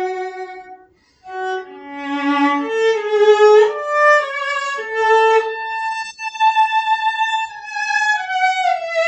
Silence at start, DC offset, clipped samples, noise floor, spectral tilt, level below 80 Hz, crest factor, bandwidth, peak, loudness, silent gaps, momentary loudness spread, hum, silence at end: 0 s; under 0.1%; under 0.1%; -50 dBFS; -1.5 dB/octave; -66 dBFS; 16 dB; 8.6 kHz; -2 dBFS; -16 LUFS; none; 14 LU; none; 0 s